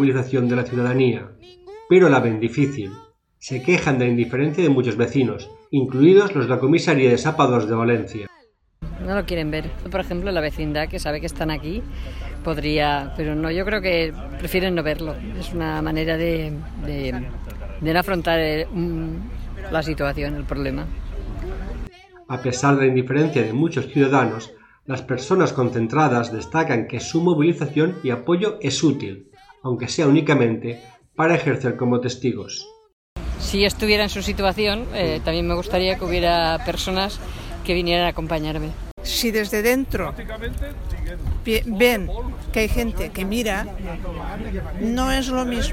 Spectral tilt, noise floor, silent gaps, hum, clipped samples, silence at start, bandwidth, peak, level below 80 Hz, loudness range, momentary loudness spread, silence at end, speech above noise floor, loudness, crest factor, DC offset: -5.5 dB/octave; -56 dBFS; 32.93-33.16 s, 38.91-38.97 s; none; under 0.1%; 0 s; 17 kHz; -2 dBFS; -34 dBFS; 7 LU; 14 LU; 0 s; 35 dB; -21 LUFS; 18 dB; under 0.1%